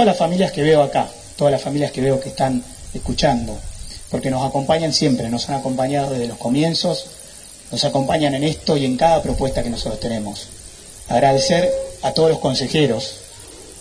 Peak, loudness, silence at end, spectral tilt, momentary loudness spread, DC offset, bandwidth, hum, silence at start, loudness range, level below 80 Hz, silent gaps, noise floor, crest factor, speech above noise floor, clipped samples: -2 dBFS; -19 LUFS; 0 s; -5 dB/octave; 18 LU; under 0.1%; 11 kHz; none; 0 s; 2 LU; -38 dBFS; none; -39 dBFS; 18 dB; 21 dB; under 0.1%